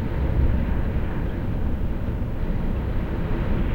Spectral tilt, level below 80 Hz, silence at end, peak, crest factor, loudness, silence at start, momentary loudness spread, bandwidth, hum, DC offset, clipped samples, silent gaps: -9.5 dB/octave; -26 dBFS; 0 s; -10 dBFS; 12 dB; -27 LUFS; 0 s; 5 LU; 16 kHz; none; under 0.1%; under 0.1%; none